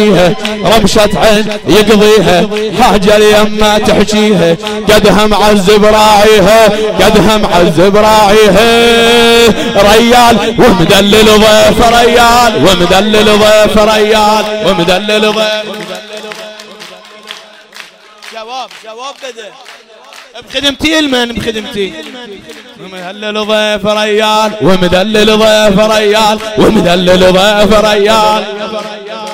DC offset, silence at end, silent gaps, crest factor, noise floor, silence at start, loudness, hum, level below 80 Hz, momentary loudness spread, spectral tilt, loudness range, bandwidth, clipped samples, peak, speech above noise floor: under 0.1%; 0 s; none; 8 dB; -33 dBFS; 0 s; -6 LUFS; none; -26 dBFS; 18 LU; -4 dB/octave; 13 LU; 16.5 kHz; under 0.1%; 0 dBFS; 27 dB